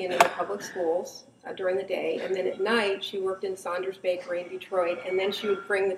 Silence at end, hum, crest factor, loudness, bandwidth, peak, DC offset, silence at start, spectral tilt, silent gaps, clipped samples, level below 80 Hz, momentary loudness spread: 0 s; none; 26 dB; -28 LUFS; 15 kHz; -2 dBFS; under 0.1%; 0 s; -3.5 dB/octave; none; under 0.1%; -76 dBFS; 8 LU